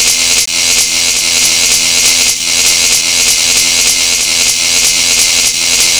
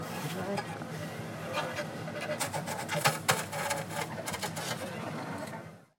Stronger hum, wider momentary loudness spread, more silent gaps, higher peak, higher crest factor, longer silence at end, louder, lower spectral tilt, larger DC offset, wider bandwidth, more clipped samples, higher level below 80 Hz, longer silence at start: neither; second, 2 LU vs 10 LU; neither; first, 0 dBFS vs -8 dBFS; second, 8 dB vs 28 dB; second, 0 s vs 0.15 s; first, -7 LUFS vs -34 LUFS; second, 2 dB/octave vs -3.5 dB/octave; first, 0.3% vs under 0.1%; first, over 20 kHz vs 17 kHz; neither; first, -38 dBFS vs -70 dBFS; about the same, 0 s vs 0 s